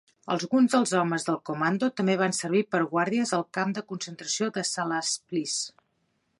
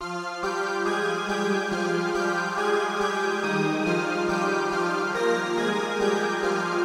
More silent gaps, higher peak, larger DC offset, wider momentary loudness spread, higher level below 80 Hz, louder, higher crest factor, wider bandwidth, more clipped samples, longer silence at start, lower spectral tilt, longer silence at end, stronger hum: neither; about the same, -10 dBFS vs -12 dBFS; neither; first, 8 LU vs 2 LU; second, -78 dBFS vs -60 dBFS; about the same, -27 LUFS vs -25 LUFS; about the same, 18 dB vs 14 dB; second, 11.5 kHz vs 15.5 kHz; neither; first, 0.25 s vs 0 s; about the same, -4 dB/octave vs -4.5 dB/octave; first, 0.7 s vs 0 s; neither